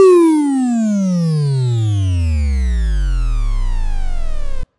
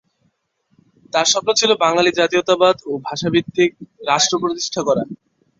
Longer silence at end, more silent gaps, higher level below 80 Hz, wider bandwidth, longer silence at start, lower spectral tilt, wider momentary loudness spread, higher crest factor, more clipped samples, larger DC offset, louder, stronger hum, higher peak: second, 0.15 s vs 0.45 s; neither; first, -18 dBFS vs -60 dBFS; first, 11.5 kHz vs 7.8 kHz; second, 0 s vs 1.15 s; first, -8 dB/octave vs -3 dB/octave; first, 13 LU vs 8 LU; about the same, 14 dB vs 18 dB; neither; neither; about the same, -17 LUFS vs -17 LUFS; neither; about the same, 0 dBFS vs -2 dBFS